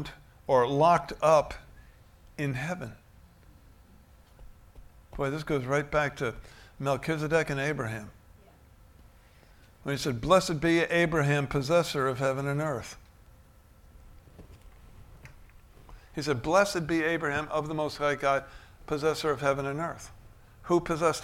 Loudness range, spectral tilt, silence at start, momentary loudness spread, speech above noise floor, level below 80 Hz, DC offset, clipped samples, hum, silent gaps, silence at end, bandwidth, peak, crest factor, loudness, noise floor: 12 LU; -5.5 dB/octave; 0 s; 19 LU; 29 dB; -52 dBFS; under 0.1%; under 0.1%; none; none; 0 s; 16.5 kHz; -10 dBFS; 20 dB; -28 LUFS; -56 dBFS